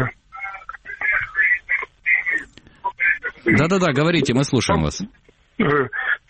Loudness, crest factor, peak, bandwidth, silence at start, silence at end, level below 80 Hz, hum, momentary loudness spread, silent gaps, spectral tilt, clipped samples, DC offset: -19 LUFS; 16 dB; -4 dBFS; 8.8 kHz; 0 s; 0.15 s; -44 dBFS; none; 14 LU; none; -5 dB/octave; under 0.1%; under 0.1%